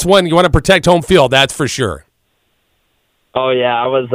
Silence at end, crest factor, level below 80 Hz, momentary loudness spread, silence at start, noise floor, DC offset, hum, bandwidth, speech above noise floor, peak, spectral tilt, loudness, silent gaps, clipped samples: 0 s; 14 dB; -32 dBFS; 10 LU; 0 s; -62 dBFS; under 0.1%; none; 16 kHz; 51 dB; 0 dBFS; -4.5 dB/octave; -12 LUFS; none; 0.2%